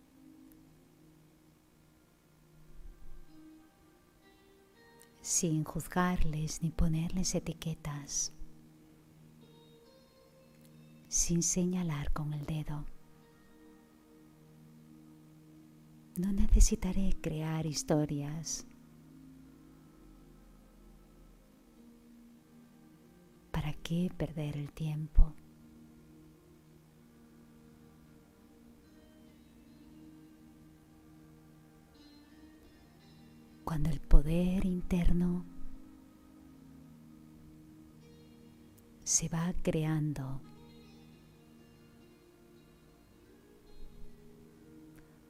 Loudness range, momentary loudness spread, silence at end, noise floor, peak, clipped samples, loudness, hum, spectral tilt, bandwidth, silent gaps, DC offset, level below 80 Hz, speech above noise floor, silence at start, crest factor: 24 LU; 28 LU; 0.45 s; -65 dBFS; -8 dBFS; under 0.1%; -34 LUFS; none; -5 dB/octave; 15 kHz; none; under 0.1%; -40 dBFS; 35 dB; 2.75 s; 28 dB